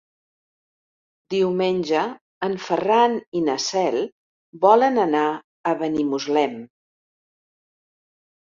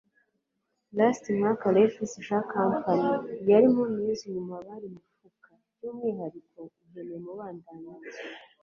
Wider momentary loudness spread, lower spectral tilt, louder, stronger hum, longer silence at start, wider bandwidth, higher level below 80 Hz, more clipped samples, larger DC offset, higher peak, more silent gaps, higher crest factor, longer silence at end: second, 11 LU vs 21 LU; second, -4.5 dB/octave vs -7 dB/octave; first, -21 LUFS vs -26 LUFS; neither; first, 1.3 s vs 0.95 s; about the same, 7.6 kHz vs 7.6 kHz; about the same, -66 dBFS vs -70 dBFS; neither; neither; first, -2 dBFS vs -10 dBFS; first, 2.21-2.41 s, 3.27-3.32 s, 4.12-4.53 s, 5.44-5.64 s vs none; about the same, 20 dB vs 20 dB; first, 1.8 s vs 0.2 s